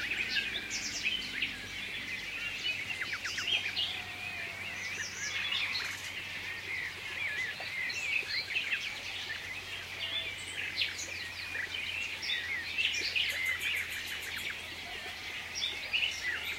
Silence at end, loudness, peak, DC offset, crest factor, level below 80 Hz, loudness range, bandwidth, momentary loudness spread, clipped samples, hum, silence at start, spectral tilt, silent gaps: 0 s; -34 LUFS; -16 dBFS; under 0.1%; 20 dB; -64 dBFS; 3 LU; 16 kHz; 7 LU; under 0.1%; none; 0 s; -0.5 dB/octave; none